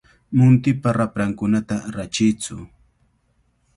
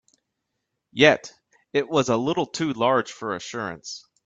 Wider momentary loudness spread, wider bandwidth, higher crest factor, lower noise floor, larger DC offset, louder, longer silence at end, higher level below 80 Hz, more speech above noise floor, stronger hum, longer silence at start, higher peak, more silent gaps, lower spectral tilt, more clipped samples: second, 12 LU vs 18 LU; first, 11.5 kHz vs 8 kHz; second, 16 dB vs 24 dB; second, -64 dBFS vs -80 dBFS; neither; first, -20 LUFS vs -23 LUFS; first, 1.1 s vs 0.25 s; first, -50 dBFS vs -64 dBFS; second, 45 dB vs 57 dB; neither; second, 0.3 s vs 0.95 s; about the same, -4 dBFS vs -2 dBFS; neither; first, -6.5 dB/octave vs -4.5 dB/octave; neither